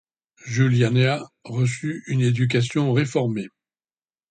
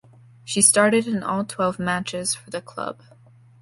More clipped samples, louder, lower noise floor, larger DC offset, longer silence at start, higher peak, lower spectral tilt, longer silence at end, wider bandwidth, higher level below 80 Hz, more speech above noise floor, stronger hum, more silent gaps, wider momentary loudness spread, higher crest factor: neither; about the same, -22 LUFS vs -21 LUFS; first, under -90 dBFS vs -51 dBFS; neither; about the same, 0.45 s vs 0.45 s; second, -6 dBFS vs -2 dBFS; first, -6.5 dB/octave vs -3 dB/octave; first, 0.85 s vs 0.7 s; second, 9.2 kHz vs 12 kHz; about the same, -56 dBFS vs -60 dBFS; first, over 69 dB vs 29 dB; neither; neither; second, 12 LU vs 17 LU; second, 16 dB vs 22 dB